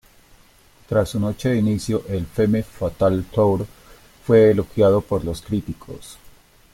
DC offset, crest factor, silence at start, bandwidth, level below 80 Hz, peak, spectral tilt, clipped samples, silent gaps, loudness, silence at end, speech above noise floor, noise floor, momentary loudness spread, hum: under 0.1%; 18 dB; 0.9 s; 16.5 kHz; -44 dBFS; -4 dBFS; -7.5 dB/octave; under 0.1%; none; -20 LUFS; 0.6 s; 33 dB; -52 dBFS; 17 LU; none